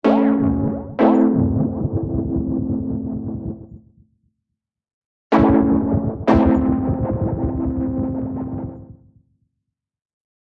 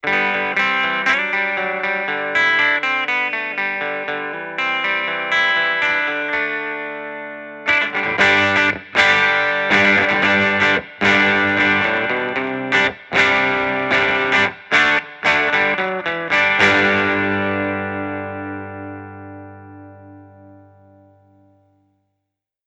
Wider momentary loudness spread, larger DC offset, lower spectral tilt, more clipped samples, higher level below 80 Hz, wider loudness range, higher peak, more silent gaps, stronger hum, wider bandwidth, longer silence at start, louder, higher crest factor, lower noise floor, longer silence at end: about the same, 13 LU vs 13 LU; neither; first, -10.5 dB/octave vs -4 dB/octave; neither; first, -36 dBFS vs -56 dBFS; about the same, 8 LU vs 6 LU; about the same, 0 dBFS vs 0 dBFS; first, 4.94-5.30 s vs none; second, none vs 50 Hz at -50 dBFS; second, 5.8 kHz vs 10.5 kHz; about the same, 0.05 s vs 0.05 s; second, -19 LUFS vs -16 LUFS; about the same, 20 dB vs 18 dB; about the same, -81 dBFS vs -79 dBFS; second, 1.6 s vs 2.1 s